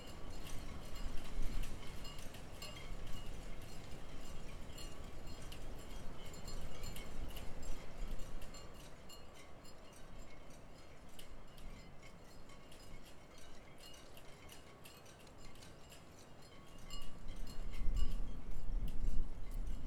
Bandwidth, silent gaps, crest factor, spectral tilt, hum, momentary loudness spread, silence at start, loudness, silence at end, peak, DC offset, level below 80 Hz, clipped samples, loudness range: 13.5 kHz; none; 18 dB; -4.5 dB/octave; none; 11 LU; 0 s; -52 LUFS; 0 s; -20 dBFS; under 0.1%; -44 dBFS; under 0.1%; 9 LU